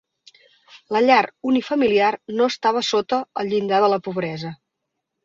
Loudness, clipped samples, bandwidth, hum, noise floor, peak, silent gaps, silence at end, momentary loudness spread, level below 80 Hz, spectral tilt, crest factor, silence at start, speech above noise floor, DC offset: -20 LUFS; under 0.1%; 7.8 kHz; none; -79 dBFS; -4 dBFS; none; 0.7 s; 10 LU; -64 dBFS; -5 dB/octave; 18 dB; 0.75 s; 60 dB; under 0.1%